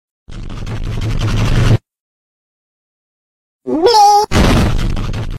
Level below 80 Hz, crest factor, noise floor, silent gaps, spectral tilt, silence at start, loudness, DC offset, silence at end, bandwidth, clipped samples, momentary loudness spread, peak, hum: -20 dBFS; 14 dB; under -90 dBFS; 2.00-3.60 s; -5.5 dB/octave; 0.3 s; -13 LUFS; under 0.1%; 0 s; 16 kHz; under 0.1%; 19 LU; 0 dBFS; none